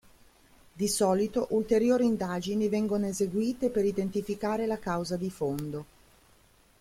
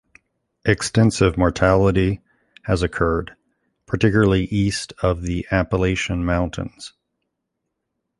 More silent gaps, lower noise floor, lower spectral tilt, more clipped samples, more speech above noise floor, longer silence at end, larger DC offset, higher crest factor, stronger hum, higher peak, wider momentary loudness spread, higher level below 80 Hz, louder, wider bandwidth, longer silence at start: neither; second, -62 dBFS vs -78 dBFS; about the same, -5.5 dB/octave vs -6 dB/octave; neither; second, 33 dB vs 59 dB; second, 0.95 s vs 1.3 s; neither; about the same, 16 dB vs 18 dB; neither; second, -12 dBFS vs -2 dBFS; second, 7 LU vs 14 LU; second, -58 dBFS vs -34 dBFS; second, -29 LUFS vs -20 LUFS; first, 16 kHz vs 11.5 kHz; about the same, 0.75 s vs 0.65 s